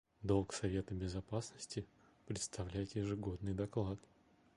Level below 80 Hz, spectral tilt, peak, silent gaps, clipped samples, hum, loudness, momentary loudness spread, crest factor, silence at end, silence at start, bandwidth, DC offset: -56 dBFS; -6 dB/octave; -22 dBFS; none; under 0.1%; none; -42 LUFS; 9 LU; 20 dB; 0.55 s; 0.2 s; 11 kHz; under 0.1%